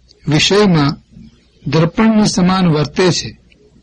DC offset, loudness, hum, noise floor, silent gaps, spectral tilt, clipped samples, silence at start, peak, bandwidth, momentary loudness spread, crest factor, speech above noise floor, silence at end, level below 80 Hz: under 0.1%; -13 LUFS; none; -41 dBFS; none; -5.5 dB/octave; under 0.1%; 0.25 s; 0 dBFS; 10.5 kHz; 10 LU; 14 dB; 29 dB; 0.5 s; -40 dBFS